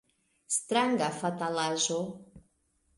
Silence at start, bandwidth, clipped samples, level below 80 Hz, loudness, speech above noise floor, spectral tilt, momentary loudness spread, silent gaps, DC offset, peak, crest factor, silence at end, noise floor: 0.5 s; 11.5 kHz; under 0.1%; -70 dBFS; -30 LUFS; 43 dB; -3 dB/octave; 8 LU; none; under 0.1%; -14 dBFS; 18 dB; 0.6 s; -73 dBFS